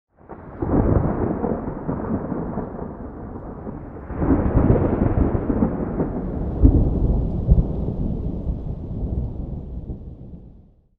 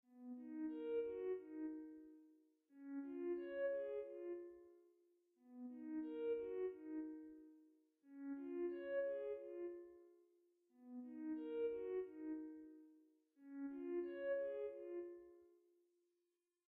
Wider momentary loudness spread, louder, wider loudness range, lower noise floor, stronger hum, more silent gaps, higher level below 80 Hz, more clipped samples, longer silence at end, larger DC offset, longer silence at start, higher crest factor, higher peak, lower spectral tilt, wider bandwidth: second, 16 LU vs 19 LU; first, -23 LUFS vs -48 LUFS; first, 6 LU vs 2 LU; second, -49 dBFS vs -90 dBFS; neither; neither; first, -26 dBFS vs -88 dBFS; neither; second, 0.4 s vs 1.2 s; neither; first, 0.3 s vs 0.1 s; first, 20 dB vs 14 dB; first, -2 dBFS vs -36 dBFS; first, -13 dB/octave vs -4.5 dB/octave; second, 2.9 kHz vs 4.1 kHz